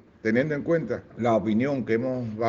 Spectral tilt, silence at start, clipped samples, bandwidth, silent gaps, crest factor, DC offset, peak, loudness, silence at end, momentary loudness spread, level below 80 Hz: -6.5 dB/octave; 0.25 s; under 0.1%; 7.4 kHz; none; 16 dB; under 0.1%; -8 dBFS; -26 LUFS; 0 s; 5 LU; -60 dBFS